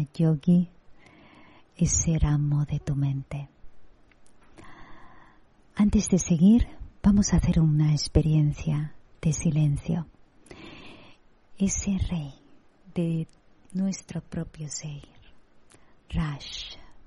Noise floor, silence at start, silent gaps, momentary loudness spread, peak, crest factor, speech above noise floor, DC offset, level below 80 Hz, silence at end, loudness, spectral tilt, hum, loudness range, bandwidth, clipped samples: -56 dBFS; 0 s; none; 17 LU; -8 dBFS; 18 dB; 32 dB; under 0.1%; -38 dBFS; 0.05 s; -26 LUFS; -6 dB/octave; none; 11 LU; 11 kHz; under 0.1%